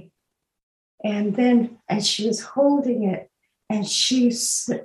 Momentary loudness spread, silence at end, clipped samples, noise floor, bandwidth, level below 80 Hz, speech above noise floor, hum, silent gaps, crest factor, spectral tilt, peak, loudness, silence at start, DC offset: 9 LU; 0 s; under 0.1%; -79 dBFS; 12.5 kHz; -72 dBFS; 58 dB; none; none; 16 dB; -3.5 dB/octave; -6 dBFS; -21 LUFS; 1.05 s; under 0.1%